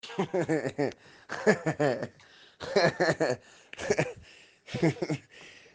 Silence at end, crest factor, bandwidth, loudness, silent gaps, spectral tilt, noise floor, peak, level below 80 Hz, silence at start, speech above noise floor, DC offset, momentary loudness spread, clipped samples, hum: 0.15 s; 22 dB; 9.8 kHz; -30 LUFS; none; -5.5 dB/octave; -54 dBFS; -8 dBFS; -66 dBFS; 0.05 s; 24 dB; under 0.1%; 16 LU; under 0.1%; none